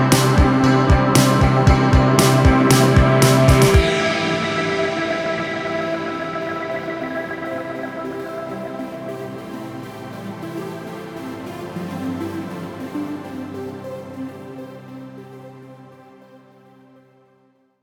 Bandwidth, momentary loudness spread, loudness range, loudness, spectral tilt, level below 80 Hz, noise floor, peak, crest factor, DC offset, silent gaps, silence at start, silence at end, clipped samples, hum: 16.5 kHz; 19 LU; 19 LU; -18 LUFS; -5.5 dB/octave; -28 dBFS; -59 dBFS; -2 dBFS; 18 dB; under 0.1%; none; 0 s; 1.45 s; under 0.1%; none